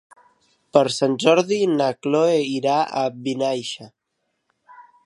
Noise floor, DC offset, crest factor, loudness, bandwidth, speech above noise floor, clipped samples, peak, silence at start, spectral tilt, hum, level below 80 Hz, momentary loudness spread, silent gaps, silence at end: -75 dBFS; under 0.1%; 20 dB; -20 LUFS; 11.5 kHz; 55 dB; under 0.1%; 0 dBFS; 0.75 s; -5 dB/octave; none; -72 dBFS; 7 LU; none; 0.25 s